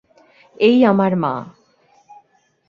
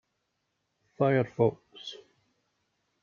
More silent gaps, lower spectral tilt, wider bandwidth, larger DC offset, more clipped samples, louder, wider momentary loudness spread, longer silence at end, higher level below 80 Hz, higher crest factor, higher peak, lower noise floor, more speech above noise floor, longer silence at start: neither; first, -8.5 dB/octave vs -6 dB/octave; about the same, 6.6 kHz vs 7.2 kHz; neither; neither; first, -16 LUFS vs -28 LUFS; second, 11 LU vs 17 LU; about the same, 1.2 s vs 1.1 s; first, -62 dBFS vs -72 dBFS; about the same, 18 dB vs 22 dB; first, -2 dBFS vs -10 dBFS; second, -58 dBFS vs -80 dBFS; second, 43 dB vs 52 dB; second, 0.6 s vs 1 s